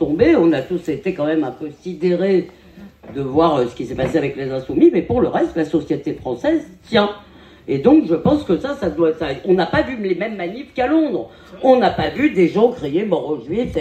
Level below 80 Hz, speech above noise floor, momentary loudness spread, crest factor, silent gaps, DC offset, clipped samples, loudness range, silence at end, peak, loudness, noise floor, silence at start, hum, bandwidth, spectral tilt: -44 dBFS; 23 dB; 11 LU; 16 dB; none; under 0.1%; under 0.1%; 2 LU; 0 s; -2 dBFS; -18 LUFS; -40 dBFS; 0 s; none; 8.6 kHz; -7.5 dB/octave